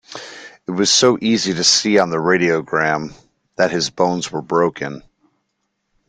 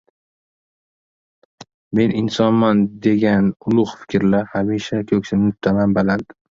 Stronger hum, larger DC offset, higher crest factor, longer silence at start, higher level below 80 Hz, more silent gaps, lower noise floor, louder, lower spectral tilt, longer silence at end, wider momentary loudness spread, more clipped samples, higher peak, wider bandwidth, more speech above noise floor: neither; neither; about the same, 18 dB vs 16 dB; second, 0.1 s vs 1.6 s; second, -58 dBFS vs -50 dBFS; second, none vs 1.74-1.91 s; second, -72 dBFS vs under -90 dBFS; about the same, -16 LUFS vs -18 LUFS; second, -3 dB/octave vs -7.5 dB/octave; first, 1.1 s vs 0.35 s; first, 20 LU vs 6 LU; neither; about the same, 0 dBFS vs -2 dBFS; first, 10.5 kHz vs 7.4 kHz; second, 55 dB vs over 73 dB